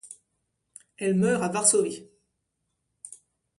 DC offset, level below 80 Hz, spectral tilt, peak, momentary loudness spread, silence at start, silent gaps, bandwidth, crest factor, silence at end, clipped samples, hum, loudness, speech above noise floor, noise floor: under 0.1%; -72 dBFS; -4 dB/octave; -6 dBFS; 24 LU; 0.05 s; none; 11.5 kHz; 22 dB; 0.45 s; under 0.1%; none; -24 LUFS; 55 dB; -79 dBFS